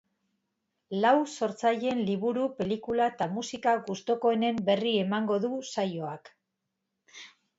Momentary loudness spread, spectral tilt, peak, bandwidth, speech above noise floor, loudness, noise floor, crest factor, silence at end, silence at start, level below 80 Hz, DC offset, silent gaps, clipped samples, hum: 11 LU; -5.5 dB/octave; -10 dBFS; 8 kHz; 55 dB; -29 LUFS; -83 dBFS; 20 dB; 0.3 s; 0.9 s; -70 dBFS; under 0.1%; none; under 0.1%; none